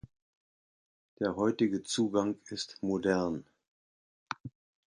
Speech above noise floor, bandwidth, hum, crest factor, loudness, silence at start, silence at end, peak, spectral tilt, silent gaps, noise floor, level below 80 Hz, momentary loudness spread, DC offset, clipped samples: over 59 dB; 11.5 kHz; none; 20 dB; -33 LUFS; 1.2 s; 0.45 s; -14 dBFS; -5 dB/octave; 3.68-4.26 s; under -90 dBFS; -66 dBFS; 13 LU; under 0.1%; under 0.1%